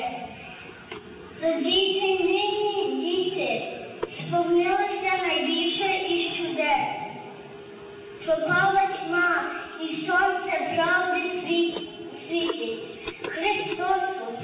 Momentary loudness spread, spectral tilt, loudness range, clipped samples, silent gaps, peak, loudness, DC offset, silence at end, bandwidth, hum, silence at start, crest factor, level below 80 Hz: 18 LU; -8 dB/octave; 2 LU; under 0.1%; none; -12 dBFS; -25 LUFS; under 0.1%; 0 s; 4 kHz; none; 0 s; 14 dB; -62 dBFS